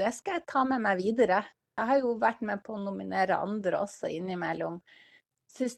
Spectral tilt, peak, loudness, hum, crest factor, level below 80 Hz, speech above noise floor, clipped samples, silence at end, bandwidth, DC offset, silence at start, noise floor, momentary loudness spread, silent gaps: -5.5 dB/octave; -12 dBFS; -30 LUFS; none; 18 dB; -72 dBFS; 33 dB; under 0.1%; 0.05 s; 12.5 kHz; under 0.1%; 0 s; -62 dBFS; 9 LU; none